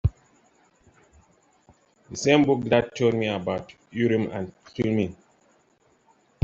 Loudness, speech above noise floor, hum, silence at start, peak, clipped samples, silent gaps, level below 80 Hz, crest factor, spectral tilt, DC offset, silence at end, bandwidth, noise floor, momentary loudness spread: -25 LUFS; 40 dB; none; 0.05 s; -4 dBFS; under 0.1%; none; -48 dBFS; 22 dB; -6 dB/octave; under 0.1%; 1.3 s; 8 kHz; -64 dBFS; 14 LU